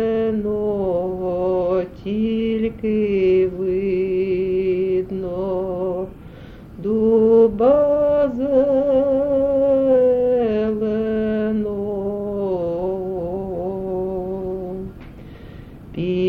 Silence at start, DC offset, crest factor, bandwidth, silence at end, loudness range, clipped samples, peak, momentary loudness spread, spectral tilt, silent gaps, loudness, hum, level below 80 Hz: 0 s; under 0.1%; 14 dB; 4.9 kHz; 0 s; 8 LU; under 0.1%; -4 dBFS; 14 LU; -9.5 dB/octave; none; -20 LUFS; none; -42 dBFS